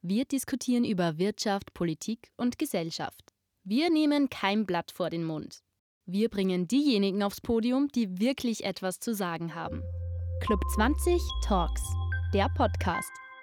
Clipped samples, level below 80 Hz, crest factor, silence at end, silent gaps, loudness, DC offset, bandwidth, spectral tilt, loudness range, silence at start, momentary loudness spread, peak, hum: under 0.1%; -40 dBFS; 18 dB; 0 s; 5.79-6.01 s; -30 LUFS; under 0.1%; 19 kHz; -5.5 dB/octave; 2 LU; 0.05 s; 10 LU; -12 dBFS; none